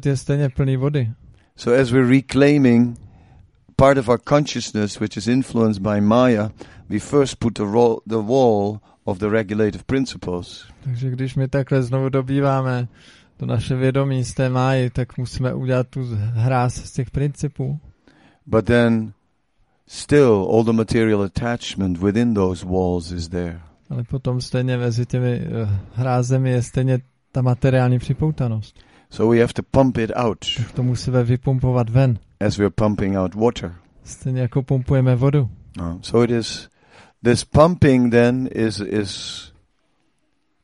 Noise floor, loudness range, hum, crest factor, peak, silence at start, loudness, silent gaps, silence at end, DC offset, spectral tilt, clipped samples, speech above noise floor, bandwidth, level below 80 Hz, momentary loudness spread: -69 dBFS; 4 LU; none; 18 dB; 0 dBFS; 0 s; -19 LUFS; none; 1.15 s; under 0.1%; -7 dB/octave; under 0.1%; 51 dB; 11.5 kHz; -42 dBFS; 13 LU